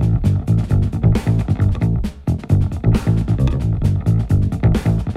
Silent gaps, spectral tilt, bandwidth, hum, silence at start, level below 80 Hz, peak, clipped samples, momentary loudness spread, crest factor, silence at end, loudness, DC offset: none; -9 dB/octave; 10.5 kHz; none; 0 s; -24 dBFS; -4 dBFS; under 0.1%; 2 LU; 12 dB; 0 s; -18 LUFS; under 0.1%